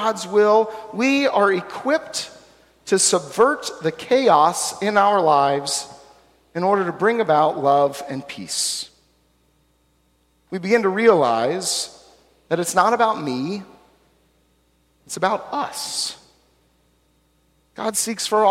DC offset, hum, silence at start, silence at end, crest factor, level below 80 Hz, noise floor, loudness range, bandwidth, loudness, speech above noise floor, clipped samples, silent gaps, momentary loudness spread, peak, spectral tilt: under 0.1%; none; 0 s; 0 s; 18 dB; -64 dBFS; -62 dBFS; 9 LU; 16.5 kHz; -19 LUFS; 43 dB; under 0.1%; none; 13 LU; -2 dBFS; -3 dB/octave